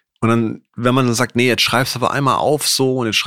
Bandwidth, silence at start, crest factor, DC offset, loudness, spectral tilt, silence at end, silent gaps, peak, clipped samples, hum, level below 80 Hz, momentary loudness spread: 16.5 kHz; 0.2 s; 16 dB; 0.5%; -16 LUFS; -4 dB/octave; 0 s; none; 0 dBFS; under 0.1%; none; -52 dBFS; 4 LU